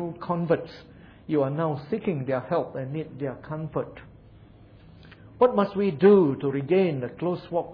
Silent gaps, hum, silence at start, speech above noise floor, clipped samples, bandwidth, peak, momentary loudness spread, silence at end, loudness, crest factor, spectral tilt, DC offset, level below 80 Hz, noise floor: none; none; 0 s; 26 dB; under 0.1%; 5.2 kHz; -8 dBFS; 14 LU; 0 s; -25 LUFS; 18 dB; -10.5 dB/octave; under 0.1%; -58 dBFS; -50 dBFS